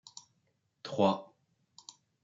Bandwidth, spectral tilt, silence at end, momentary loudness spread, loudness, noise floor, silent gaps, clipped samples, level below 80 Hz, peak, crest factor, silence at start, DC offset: 7.8 kHz; -5.5 dB/octave; 1 s; 23 LU; -32 LUFS; -77 dBFS; none; under 0.1%; -84 dBFS; -14 dBFS; 22 dB; 0.85 s; under 0.1%